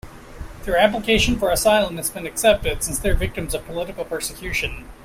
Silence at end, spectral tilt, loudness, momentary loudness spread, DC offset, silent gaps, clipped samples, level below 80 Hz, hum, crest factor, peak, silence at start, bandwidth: 0 s; -3.5 dB/octave; -21 LUFS; 11 LU; under 0.1%; none; under 0.1%; -32 dBFS; none; 20 dB; -2 dBFS; 0.05 s; 16 kHz